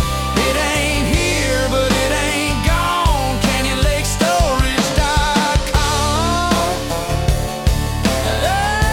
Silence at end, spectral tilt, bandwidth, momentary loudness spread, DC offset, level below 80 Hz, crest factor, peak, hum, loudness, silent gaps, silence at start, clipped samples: 0 s; -4 dB/octave; 18 kHz; 3 LU; under 0.1%; -22 dBFS; 14 dB; -2 dBFS; none; -16 LUFS; none; 0 s; under 0.1%